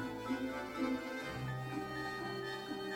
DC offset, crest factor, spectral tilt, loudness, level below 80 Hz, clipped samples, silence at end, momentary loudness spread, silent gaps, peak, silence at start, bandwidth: under 0.1%; 16 dB; -5.5 dB/octave; -41 LUFS; -64 dBFS; under 0.1%; 0 s; 4 LU; none; -26 dBFS; 0 s; 17.5 kHz